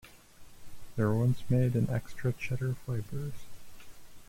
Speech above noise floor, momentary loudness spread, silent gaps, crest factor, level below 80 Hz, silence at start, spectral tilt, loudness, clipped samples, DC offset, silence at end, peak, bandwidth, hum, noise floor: 21 dB; 12 LU; none; 16 dB; -54 dBFS; 0.05 s; -8 dB/octave; -32 LUFS; under 0.1%; under 0.1%; 0.05 s; -16 dBFS; 16.5 kHz; none; -51 dBFS